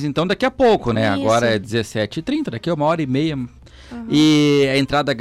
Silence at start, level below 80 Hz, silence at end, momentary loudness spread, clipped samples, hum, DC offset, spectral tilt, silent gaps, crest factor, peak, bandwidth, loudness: 0 s; -44 dBFS; 0 s; 9 LU; under 0.1%; none; under 0.1%; -5.5 dB/octave; none; 10 dB; -8 dBFS; 13.5 kHz; -18 LUFS